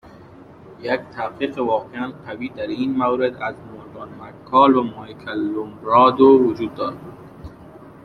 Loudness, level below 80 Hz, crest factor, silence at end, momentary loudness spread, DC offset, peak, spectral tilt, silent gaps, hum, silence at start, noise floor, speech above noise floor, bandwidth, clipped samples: -19 LUFS; -56 dBFS; 18 dB; 0.15 s; 24 LU; under 0.1%; -2 dBFS; -8 dB/octave; none; none; 0.4 s; -43 dBFS; 24 dB; 5.8 kHz; under 0.1%